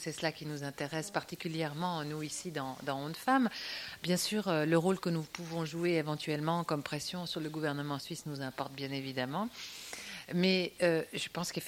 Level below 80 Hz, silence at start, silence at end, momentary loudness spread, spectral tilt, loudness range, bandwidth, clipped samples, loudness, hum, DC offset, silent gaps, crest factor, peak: -70 dBFS; 0 s; 0 s; 10 LU; -4.5 dB/octave; 5 LU; 16.5 kHz; under 0.1%; -35 LUFS; none; under 0.1%; none; 20 dB; -14 dBFS